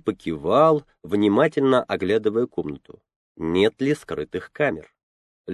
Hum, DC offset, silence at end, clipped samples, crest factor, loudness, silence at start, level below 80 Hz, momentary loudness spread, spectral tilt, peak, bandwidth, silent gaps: none; under 0.1%; 0 s; under 0.1%; 18 dB; -22 LUFS; 0.05 s; -54 dBFS; 13 LU; -7 dB/octave; -4 dBFS; 12 kHz; 3.16-3.35 s, 5.03-5.44 s